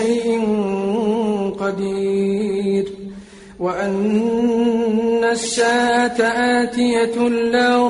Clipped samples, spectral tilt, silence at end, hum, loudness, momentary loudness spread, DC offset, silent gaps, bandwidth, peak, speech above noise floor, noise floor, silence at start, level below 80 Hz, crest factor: under 0.1%; -5 dB/octave; 0 s; none; -18 LUFS; 6 LU; under 0.1%; none; 11 kHz; -4 dBFS; 21 dB; -38 dBFS; 0 s; -52 dBFS; 14 dB